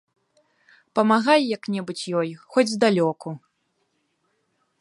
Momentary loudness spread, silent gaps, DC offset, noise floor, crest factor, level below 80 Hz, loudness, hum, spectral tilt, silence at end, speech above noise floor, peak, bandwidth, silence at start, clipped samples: 12 LU; none; under 0.1%; -72 dBFS; 20 dB; -76 dBFS; -22 LUFS; none; -5 dB/octave; 1.45 s; 50 dB; -4 dBFS; 11.5 kHz; 0.95 s; under 0.1%